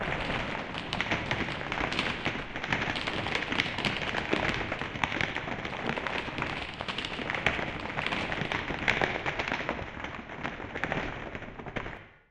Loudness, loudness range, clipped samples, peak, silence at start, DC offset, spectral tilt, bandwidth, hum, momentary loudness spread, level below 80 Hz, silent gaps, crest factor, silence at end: -32 LUFS; 2 LU; under 0.1%; -6 dBFS; 0 s; under 0.1%; -4.5 dB/octave; 15.5 kHz; none; 9 LU; -48 dBFS; none; 26 dB; 0.15 s